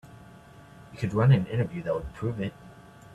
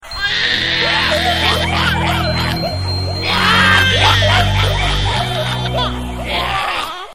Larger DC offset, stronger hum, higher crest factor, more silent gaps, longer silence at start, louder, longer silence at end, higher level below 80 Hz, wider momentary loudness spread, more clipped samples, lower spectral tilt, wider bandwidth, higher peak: second, under 0.1% vs 0.9%; neither; about the same, 18 dB vs 16 dB; neither; about the same, 0.05 s vs 0 s; second, -27 LUFS vs -14 LUFS; about the same, 0 s vs 0 s; second, -52 dBFS vs -28 dBFS; first, 13 LU vs 9 LU; neither; first, -8.5 dB/octave vs -4 dB/octave; second, 8.4 kHz vs 16 kHz; second, -10 dBFS vs 0 dBFS